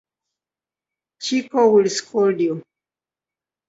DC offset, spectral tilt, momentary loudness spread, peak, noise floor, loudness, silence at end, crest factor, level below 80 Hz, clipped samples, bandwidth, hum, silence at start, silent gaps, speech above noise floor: under 0.1%; -4.5 dB/octave; 11 LU; -4 dBFS; under -90 dBFS; -19 LUFS; 1.1 s; 18 dB; -70 dBFS; under 0.1%; 8 kHz; none; 1.2 s; none; over 72 dB